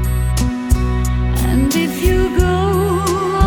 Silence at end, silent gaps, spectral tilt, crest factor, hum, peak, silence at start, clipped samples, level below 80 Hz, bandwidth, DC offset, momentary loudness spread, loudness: 0 s; none; -6 dB/octave; 14 dB; none; 0 dBFS; 0 s; under 0.1%; -20 dBFS; over 20 kHz; under 0.1%; 3 LU; -16 LUFS